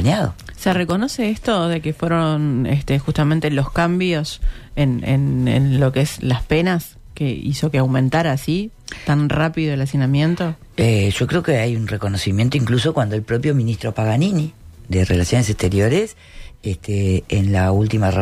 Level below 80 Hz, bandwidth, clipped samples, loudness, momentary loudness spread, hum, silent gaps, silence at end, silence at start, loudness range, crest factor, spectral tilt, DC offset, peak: -36 dBFS; 15 kHz; under 0.1%; -19 LUFS; 7 LU; none; none; 0 s; 0 s; 1 LU; 12 dB; -6.5 dB/octave; under 0.1%; -6 dBFS